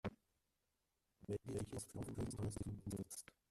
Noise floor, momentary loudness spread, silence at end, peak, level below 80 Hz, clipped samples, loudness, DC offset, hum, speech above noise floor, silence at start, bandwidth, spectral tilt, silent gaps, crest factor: -88 dBFS; 6 LU; 0.3 s; -32 dBFS; -64 dBFS; under 0.1%; -48 LUFS; under 0.1%; none; 41 dB; 0.05 s; 14 kHz; -6 dB/octave; none; 16 dB